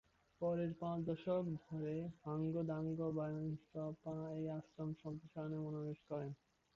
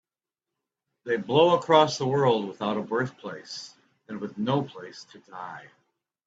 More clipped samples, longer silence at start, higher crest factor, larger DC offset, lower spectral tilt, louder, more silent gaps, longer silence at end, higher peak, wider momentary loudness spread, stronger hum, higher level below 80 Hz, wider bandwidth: neither; second, 0.4 s vs 1.05 s; second, 16 dB vs 22 dB; neither; first, -9 dB/octave vs -5.5 dB/octave; second, -44 LUFS vs -24 LUFS; neither; second, 0.4 s vs 0.65 s; second, -28 dBFS vs -4 dBFS; second, 7 LU vs 22 LU; neither; about the same, -74 dBFS vs -70 dBFS; second, 6.8 kHz vs 8 kHz